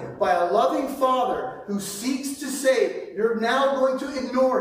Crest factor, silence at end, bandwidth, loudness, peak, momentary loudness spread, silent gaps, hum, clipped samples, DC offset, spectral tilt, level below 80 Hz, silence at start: 16 dB; 0 s; 16 kHz; -23 LUFS; -8 dBFS; 8 LU; none; none; under 0.1%; under 0.1%; -4 dB/octave; -62 dBFS; 0 s